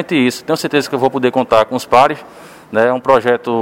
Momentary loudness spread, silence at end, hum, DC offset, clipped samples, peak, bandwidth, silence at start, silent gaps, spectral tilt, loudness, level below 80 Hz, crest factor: 5 LU; 0 s; none; under 0.1%; 0.2%; 0 dBFS; 17 kHz; 0 s; none; -5 dB/octave; -14 LUFS; -54 dBFS; 14 dB